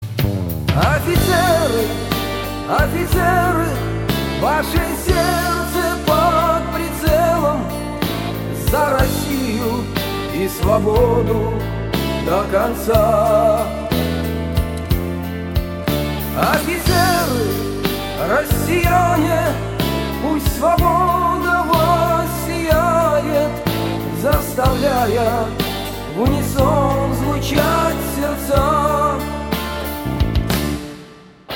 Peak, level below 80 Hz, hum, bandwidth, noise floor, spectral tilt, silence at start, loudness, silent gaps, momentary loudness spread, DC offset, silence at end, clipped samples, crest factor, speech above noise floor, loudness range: 0 dBFS; -28 dBFS; none; 17 kHz; -40 dBFS; -5.5 dB/octave; 0 s; -18 LUFS; none; 7 LU; under 0.1%; 0 s; under 0.1%; 16 dB; 25 dB; 2 LU